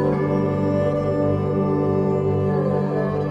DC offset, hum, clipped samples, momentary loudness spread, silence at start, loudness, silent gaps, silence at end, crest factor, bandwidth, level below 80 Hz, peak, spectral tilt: under 0.1%; 50 Hz at -45 dBFS; under 0.1%; 1 LU; 0 s; -21 LUFS; none; 0 s; 12 dB; 7.4 kHz; -46 dBFS; -10 dBFS; -10 dB/octave